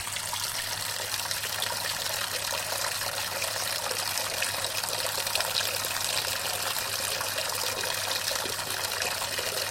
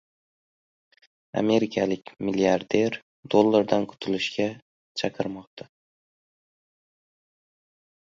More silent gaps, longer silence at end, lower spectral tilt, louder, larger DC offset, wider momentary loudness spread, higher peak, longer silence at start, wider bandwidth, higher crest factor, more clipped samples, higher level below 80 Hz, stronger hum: second, none vs 3.02-3.23 s, 4.62-4.95 s, 5.47-5.57 s; second, 0 s vs 2.6 s; second, 0 dB/octave vs -5.5 dB/octave; second, -28 LUFS vs -25 LUFS; neither; second, 3 LU vs 14 LU; second, -8 dBFS vs -4 dBFS; second, 0 s vs 1.35 s; first, 16.5 kHz vs 7.8 kHz; about the same, 24 dB vs 24 dB; neither; about the same, -60 dBFS vs -64 dBFS; neither